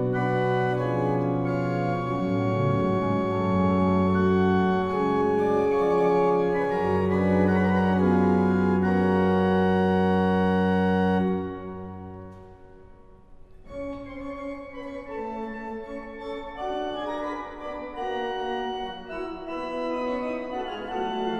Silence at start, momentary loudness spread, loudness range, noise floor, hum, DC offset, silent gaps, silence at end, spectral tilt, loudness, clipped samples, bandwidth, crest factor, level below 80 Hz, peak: 0 s; 14 LU; 14 LU; -49 dBFS; none; under 0.1%; none; 0 s; -8.5 dB/octave; -25 LUFS; under 0.1%; 7.2 kHz; 14 dB; -52 dBFS; -10 dBFS